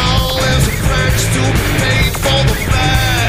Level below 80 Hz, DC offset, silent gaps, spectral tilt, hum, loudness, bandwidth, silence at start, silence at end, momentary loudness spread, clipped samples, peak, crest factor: -20 dBFS; under 0.1%; none; -4 dB/octave; none; -13 LUFS; 16 kHz; 0 s; 0 s; 1 LU; under 0.1%; 0 dBFS; 12 dB